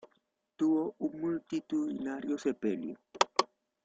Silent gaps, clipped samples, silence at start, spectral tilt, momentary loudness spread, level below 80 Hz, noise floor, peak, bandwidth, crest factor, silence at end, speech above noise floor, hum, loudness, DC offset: none; under 0.1%; 0.6 s; -4 dB/octave; 7 LU; -76 dBFS; -76 dBFS; -8 dBFS; 9.2 kHz; 26 dB; 0.4 s; 43 dB; none; -34 LUFS; under 0.1%